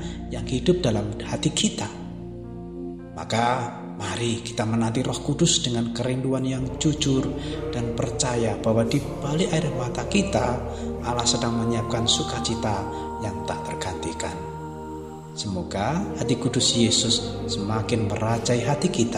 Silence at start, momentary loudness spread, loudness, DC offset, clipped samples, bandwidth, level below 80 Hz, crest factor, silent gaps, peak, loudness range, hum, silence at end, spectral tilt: 0 s; 12 LU; -24 LUFS; 0.1%; under 0.1%; 15 kHz; -42 dBFS; 18 dB; none; -6 dBFS; 5 LU; none; 0 s; -4.5 dB/octave